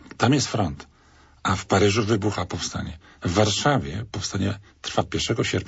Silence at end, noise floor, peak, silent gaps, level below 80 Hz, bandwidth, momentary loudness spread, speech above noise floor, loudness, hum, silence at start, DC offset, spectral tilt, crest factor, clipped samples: 0 s; -54 dBFS; -6 dBFS; none; -46 dBFS; 8.2 kHz; 12 LU; 31 dB; -24 LUFS; none; 0.05 s; under 0.1%; -4.5 dB/octave; 18 dB; under 0.1%